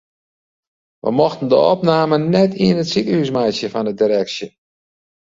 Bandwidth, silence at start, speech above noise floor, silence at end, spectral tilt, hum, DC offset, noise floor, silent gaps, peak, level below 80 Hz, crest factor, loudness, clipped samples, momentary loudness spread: 7.8 kHz; 1.05 s; over 74 dB; 0.75 s; -6.5 dB/octave; none; under 0.1%; under -90 dBFS; none; -2 dBFS; -56 dBFS; 16 dB; -16 LUFS; under 0.1%; 9 LU